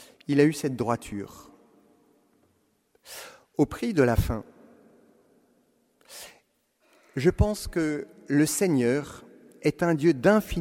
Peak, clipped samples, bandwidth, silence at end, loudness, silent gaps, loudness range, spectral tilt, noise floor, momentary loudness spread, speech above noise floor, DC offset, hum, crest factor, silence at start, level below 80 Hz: -6 dBFS; under 0.1%; 16 kHz; 0 s; -25 LUFS; none; 8 LU; -6 dB/octave; -69 dBFS; 21 LU; 45 dB; under 0.1%; none; 22 dB; 0 s; -42 dBFS